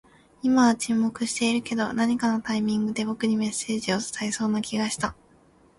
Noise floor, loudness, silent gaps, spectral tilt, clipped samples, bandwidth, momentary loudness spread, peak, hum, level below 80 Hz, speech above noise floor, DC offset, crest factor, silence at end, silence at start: -57 dBFS; -25 LUFS; none; -4 dB/octave; under 0.1%; 11.5 kHz; 7 LU; -8 dBFS; none; -60 dBFS; 33 dB; under 0.1%; 18 dB; 0.65 s; 0.45 s